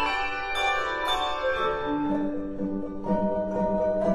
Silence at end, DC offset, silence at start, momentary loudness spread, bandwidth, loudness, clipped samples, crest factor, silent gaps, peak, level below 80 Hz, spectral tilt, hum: 0 s; under 0.1%; 0 s; 6 LU; 13 kHz; -27 LUFS; under 0.1%; 14 dB; none; -12 dBFS; -46 dBFS; -5.5 dB/octave; none